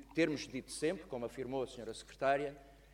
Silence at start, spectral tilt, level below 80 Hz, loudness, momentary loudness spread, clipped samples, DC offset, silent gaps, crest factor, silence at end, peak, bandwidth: 0 s; -4.5 dB/octave; -64 dBFS; -39 LUFS; 11 LU; under 0.1%; under 0.1%; none; 20 dB; 0 s; -20 dBFS; 16 kHz